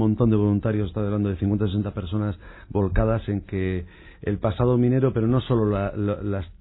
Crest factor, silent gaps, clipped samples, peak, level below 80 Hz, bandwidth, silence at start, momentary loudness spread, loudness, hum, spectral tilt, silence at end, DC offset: 16 dB; none; under 0.1%; -8 dBFS; -38 dBFS; 4.1 kHz; 0 s; 10 LU; -24 LUFS; none; -12.5 dB/octave; 0.05 s; under 0.1%